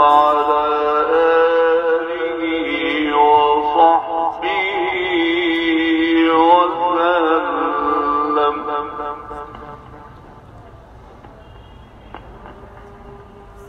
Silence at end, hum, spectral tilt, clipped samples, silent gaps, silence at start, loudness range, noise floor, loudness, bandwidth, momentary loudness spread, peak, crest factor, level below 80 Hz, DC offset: 0 s; none; -6 dB/octave; under 0.1%; none; 0 s; 10 LU; -40 dBFS; -16 LUFS; 6.6 kHz; 13 LU; 0 dBFS; 18 dB; -46 dBFS; under 0.1%